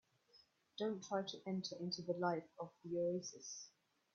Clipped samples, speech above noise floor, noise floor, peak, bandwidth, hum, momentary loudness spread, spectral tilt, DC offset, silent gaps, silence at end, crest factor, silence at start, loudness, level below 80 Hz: under 0.1%; 29 dB; -72 dBFS; -24 dBFS; 7.2 kHz; none; 12 LU; -4.5 dB/octave; under 0.1%; none; 0.45 s; 20 dB; 0.35 s; -44 LUFS; -88 dBFS